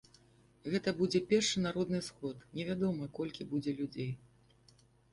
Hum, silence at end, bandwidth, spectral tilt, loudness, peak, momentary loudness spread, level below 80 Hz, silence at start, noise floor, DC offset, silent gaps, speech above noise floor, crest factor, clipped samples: none; 0.95 s; 11.5 kHz; -5 dB/octave; -35 LUFS; -18 dBFS; 12 LU; -66 dBFS; 0.65 s; -66 dBFS; under 0.1%; none; 31 dB; 18 dB; under 0.1%